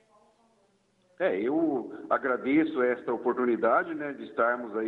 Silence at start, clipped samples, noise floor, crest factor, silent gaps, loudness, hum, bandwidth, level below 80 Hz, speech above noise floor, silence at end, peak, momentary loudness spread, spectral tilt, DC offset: 1.2 s; under 0.1%; -68 dBFS; 16 dB; none; -28 LUFS; none; 4.2 kHz; -74 dBFS; 40 dB; 0 s; -12 dBFS; 8 LU; -8 dB/octave; under 0.1%